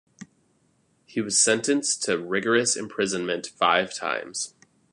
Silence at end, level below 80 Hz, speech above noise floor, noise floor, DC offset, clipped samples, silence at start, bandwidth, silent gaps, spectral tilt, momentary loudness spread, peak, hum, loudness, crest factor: 0.45 s; -70 dBFS; 42 dB; -66 dBFS; under 0.1%; under 0.1%; 0.2 s; 11.5 kHz; none; -2 dB/octave; 12 LU; -6 dBFS; none; -24 LUFS; 20 dB